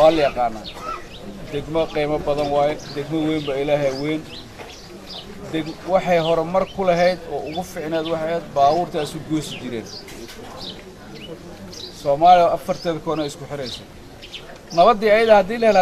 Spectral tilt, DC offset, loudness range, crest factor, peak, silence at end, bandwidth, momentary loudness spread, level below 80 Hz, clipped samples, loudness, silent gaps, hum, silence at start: -5.5 dB/octave; under 0.1%; 5 LU; 20 dB; -2 dBFS; 0 s; 14 kHz; 21 LU; -44 dBFS; under 0.1%; -20 LUFS; none; none; 0 s